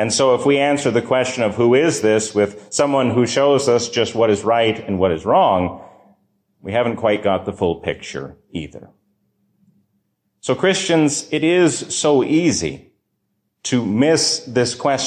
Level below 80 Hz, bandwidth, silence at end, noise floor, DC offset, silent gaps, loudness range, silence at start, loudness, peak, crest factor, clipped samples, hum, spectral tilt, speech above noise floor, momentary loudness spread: -48 dBFS; 14 kHz; 0 s; -71 dBFS; under 0.1%; none; 7 LU; 0 s; -17 LUFS; -4 dBFS; 14 dB; under 0.1%; none; -4 dB/octave; 54 dB; 13 LU